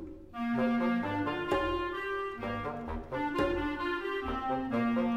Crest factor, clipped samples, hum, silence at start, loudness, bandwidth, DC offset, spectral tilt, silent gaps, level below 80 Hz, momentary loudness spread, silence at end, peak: 16 dB; under 0.1%; none; 0 s; -33 LUFS; 10 kHz; under 0.1%; -7 dB/octave; none; -50 dBFS; 7 LU; 0 s; -16 dBFS